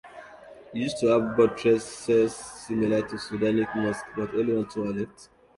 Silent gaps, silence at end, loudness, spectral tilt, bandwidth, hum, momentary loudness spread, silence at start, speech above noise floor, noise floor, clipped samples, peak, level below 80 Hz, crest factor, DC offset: none; 0.35 s; -26 LUFS; -6 dB/octave; 11.5 kHz; none; 15 LU; 0.05 s; 22 dB; -47 dBFS; under 0.1%; -8 dBFS; -58 dBFS; 18 dB; under 0.1%